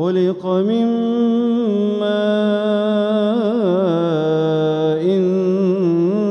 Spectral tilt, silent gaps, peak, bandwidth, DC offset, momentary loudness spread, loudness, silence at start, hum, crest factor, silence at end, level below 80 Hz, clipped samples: -8.5 dB/octave; none; -6 dBFS; 6.6 kHz; under 0.1%; 2 LU; -17 LUFS; 0 s; none; 10 dB; 0 s; -66 dBFS; under 0.1%